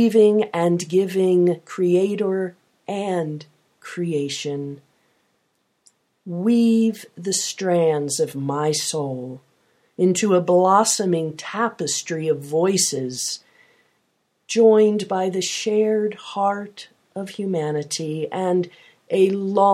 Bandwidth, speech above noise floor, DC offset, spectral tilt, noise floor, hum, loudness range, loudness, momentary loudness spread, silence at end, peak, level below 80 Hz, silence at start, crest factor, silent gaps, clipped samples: 15.5 kHz; 49 dB; under 0.1%; -4.5 dB/octave; -69 dBFS; none; 6 LU; -21 LUFS; 15 LU; 0 s; -2 dBFS; -74 dBFS; 0 s; 18 dB; none; under 0.1%